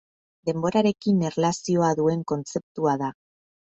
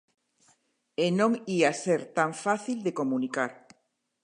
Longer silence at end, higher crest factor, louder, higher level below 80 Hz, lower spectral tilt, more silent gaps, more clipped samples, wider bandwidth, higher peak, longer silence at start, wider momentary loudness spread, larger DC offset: second, 0.55 s vs 0.7 s; about the same, 16 dB vs 20 dB; first, -24 LUFS vs -28 LUFS; first, -64 dBFS vs -80 dBFS; first, -6.5 dB/octave vs -5 dB/octave; first, 2.63-2.75 s vs none; neither; second, 8.2 kHz vs 11 kHz; about the same, -8 dBFS vs -10 dBFS; second, 0.45 s vs 1 s; about the same, 8 LU vs 7 LU; neither